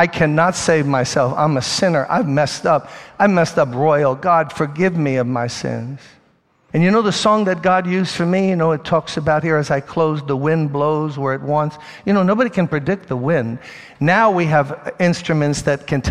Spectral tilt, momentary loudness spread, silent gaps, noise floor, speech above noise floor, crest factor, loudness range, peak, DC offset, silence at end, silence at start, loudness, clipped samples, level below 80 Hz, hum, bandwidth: -6 dB/octave; 7 LU; none; -57 dBFS; 41 dB; 16 dB; 2 LU; 0 dBFS; 0.2%; 0 s; 0 s; -17 LUFS; under 0.1%; -50 dBFS; none; 12 kHz